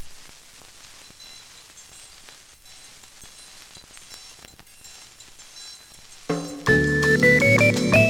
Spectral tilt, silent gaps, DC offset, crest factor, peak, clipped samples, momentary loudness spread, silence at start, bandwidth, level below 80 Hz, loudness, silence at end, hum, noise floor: -5 dB/octave; none; under 0.1%; 20 dB; -4 dBFS; under 0.1%; 28 LU; 0 s; 18 kHz; -48 dBFS; -18 LUFS; 0 s; none; -48 dBFS